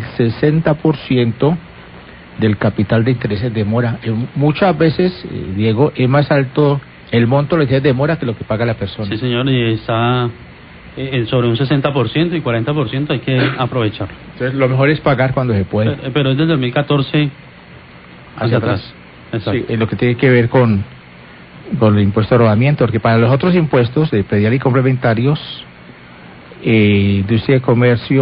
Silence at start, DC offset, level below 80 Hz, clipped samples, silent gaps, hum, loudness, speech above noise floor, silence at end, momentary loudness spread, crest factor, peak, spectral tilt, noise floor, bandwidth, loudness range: 0 s; under 0.1%; -40 dBFS; under 0.1%; none; none; -15 LUFS; 24 dB; 0 s; 9 LU; 14 dB; 0 dBFS; -13 dB/octave; -38 dBFS; 5.2 kHz; 4 LU